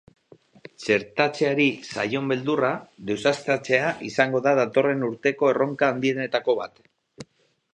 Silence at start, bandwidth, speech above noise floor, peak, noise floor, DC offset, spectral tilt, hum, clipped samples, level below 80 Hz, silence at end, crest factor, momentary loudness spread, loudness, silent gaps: 0.8 s; 10 kHz; 42 dB; -2 dBFS; -65 dBFS; under 0.1%; -5.5 dB/octave; none; under 0.1%; -68 dBFS; 0.5 s; 22 dB; 6 LU; -23 LUFS; none